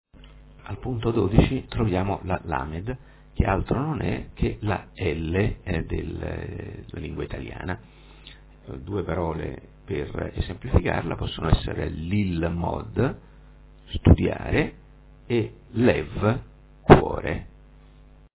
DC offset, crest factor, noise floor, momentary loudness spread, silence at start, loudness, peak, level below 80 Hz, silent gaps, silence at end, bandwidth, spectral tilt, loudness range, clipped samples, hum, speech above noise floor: under 0.1%; 26 dB; -50 dBFS; 15 LU; 0.15 s; -25 LUFS; 0 dBFS; -34 dBFS; none; 0.9 s; 4 kHz; -11.5 dB/octave; 9 LU; under 0.1%; none; 26 dB